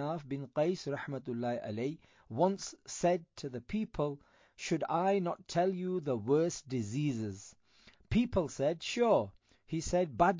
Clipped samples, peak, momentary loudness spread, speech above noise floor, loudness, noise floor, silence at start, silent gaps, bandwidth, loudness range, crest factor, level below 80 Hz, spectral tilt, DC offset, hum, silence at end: under 0.1%; -14 dBFS; 11 LU; 30 dB; -34 LUFS; -64 dBFS; 0 s; none; 7.6 kHz; 2 LU; 20 dB; -56 dBFS; -6 dB/octave; under 0.1%; none; 0 s